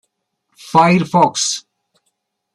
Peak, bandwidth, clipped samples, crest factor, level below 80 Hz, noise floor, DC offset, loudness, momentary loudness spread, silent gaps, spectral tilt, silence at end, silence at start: -2 dBFS; 12.5 kHz; under 0.1%; 16 dB; -58 dBFS; -71 dBFS; under 0.1%; -14 LUFS; 7 LU; none; -4 dB/octave; 0.95 s; 0.65 s